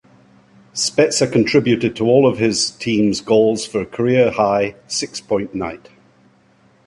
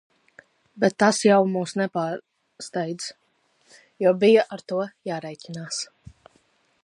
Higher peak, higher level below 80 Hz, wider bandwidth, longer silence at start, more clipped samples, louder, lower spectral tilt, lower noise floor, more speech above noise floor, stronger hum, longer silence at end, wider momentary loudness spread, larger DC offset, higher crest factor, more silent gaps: about the same, -2 dBFS vs -4 dBFS; first, -52 dBFS vs -68 dBFS; about the same, 11.5 kHz vs 11.5 kHz; about the same, 0.75 s vs 0.75 s; neither; first, -17 LUFS vs -23 LUFS; about the same, -4.5 dB/octave vs -4.5 dB/octave; second, -54 dBFS vs -65 dBFS; second, 37 dB vs 43 dB; neither; about the same, 1.1 s vs 1 s; second, 9 LU vs 18 LU; neither; about the same, 16 dB vs 20 dB; neither